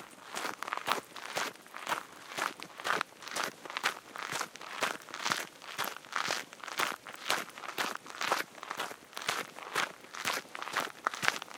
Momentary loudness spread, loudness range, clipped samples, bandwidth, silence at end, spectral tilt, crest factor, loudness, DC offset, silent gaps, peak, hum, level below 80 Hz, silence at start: 6 LU; 1 LU; under 0.1%; 18 kHz; 0 s; -0.5 dB/octave; 34 dB; -36 LUFS; under 0.1%; none; -4 dBFS; none; -84 dBFS; 0 s